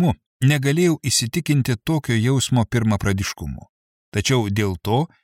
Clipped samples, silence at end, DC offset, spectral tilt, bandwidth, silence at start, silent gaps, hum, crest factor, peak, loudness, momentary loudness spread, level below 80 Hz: under 0.1%; 0.15 s; under 0.1%; -5 dB/octave; 16.5 kHz; 0 s; 0.26-0.40 s, 3.69-4.12 s; none; 16 dB; -4 dBFS; -20 LUFS; 8 LU; -44 dBFS